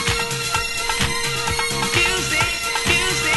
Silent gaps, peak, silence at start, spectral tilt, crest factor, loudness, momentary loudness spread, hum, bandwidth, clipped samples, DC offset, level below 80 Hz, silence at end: none; -2 dBFS; 0 s; -2 dB/octave; 18 dB; -19 LUFS; 4 LU; none; 12 kHz; under 0.1%; under 0.1%; -36 dBFS; 0 s